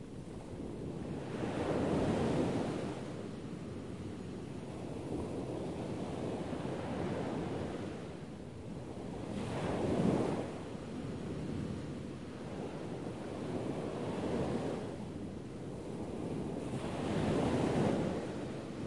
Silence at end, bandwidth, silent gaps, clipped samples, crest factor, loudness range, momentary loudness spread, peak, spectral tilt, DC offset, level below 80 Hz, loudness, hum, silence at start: 0 s; 11.5 kHz; none; under 0.1%; 18 dB; 5 LU; 11 LU; -20 dBFS; -7 dB/octave; 0.1%; -58 dBFS; -39 LUFS; none; 0 s